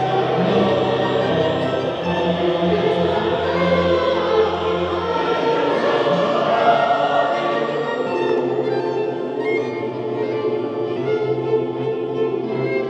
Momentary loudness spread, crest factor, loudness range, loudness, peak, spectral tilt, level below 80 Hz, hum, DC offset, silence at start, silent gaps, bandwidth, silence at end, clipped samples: 6 LU; 16 dB; 4 LU; -19 LUFS; -2 dBFS; -7 dB/octave; -52 dBFS; none; under 0.1%; 0 s; none; 8.2 kHz; 0 s; under 0.1%